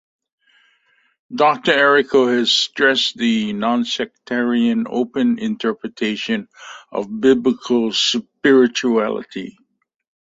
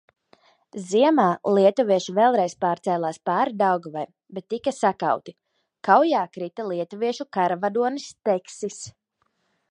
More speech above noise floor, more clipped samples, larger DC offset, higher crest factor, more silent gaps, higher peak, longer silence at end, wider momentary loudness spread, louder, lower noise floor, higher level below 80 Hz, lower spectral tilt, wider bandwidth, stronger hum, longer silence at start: second, 43 dB vs 49 dB; neither; neither; about the same, 16 dB vs 20 dB; neither; about the same, -2 dBFS vs -4 dBFS; about the same, 0.75 s vs 0.8 s; about the same, 13 LU vs 15 LU; first, -17 LUFS vs -23 LUFS; second, -61 dBFS vs -72 dBFS; first, -62 dBFS vs -74 dBFS; second, -3.5 dB/octave vs -5.5 dB/octave; second, 8 kHz vs 11 kHz; neither; first, 1.3 s vs 0.75 s